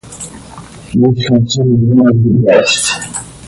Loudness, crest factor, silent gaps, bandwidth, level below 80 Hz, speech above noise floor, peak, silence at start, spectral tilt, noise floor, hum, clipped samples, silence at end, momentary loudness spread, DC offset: -10 LUFS; 12 dB; none; 11.5 kHz; -40 dBFS; 22 dB; 0 dBFS; 0.05 s; -5.5 dB/octave; -32 dBFS; none; under 0.1%; 0 s; 15 LU; under 0.1%